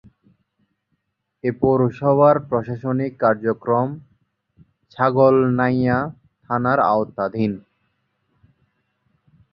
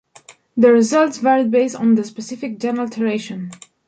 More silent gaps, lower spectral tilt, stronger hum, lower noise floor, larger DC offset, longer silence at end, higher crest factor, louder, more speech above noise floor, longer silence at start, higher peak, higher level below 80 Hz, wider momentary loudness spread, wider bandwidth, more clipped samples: neither; first, -10.5 dB/octave vs -5.5 dB/octave; neither; first, -73 dBFS vs -47 dBFS; neither; first, 1.95 s vs 0.35 s; about the same, 18 dB vs 16 dB; about the same, -19 LUFS vs -17 LUFS; first, 55 dB vs 31 dB; first, 1.45 s vs 0.3 s; about the same, -2 dBFS vs -2 dBFS; first, -54 dBFS vs -66 dBFS; second, 11 LU vs 15 LU; second, 5.6 kHz vs 9.2 kHz; neither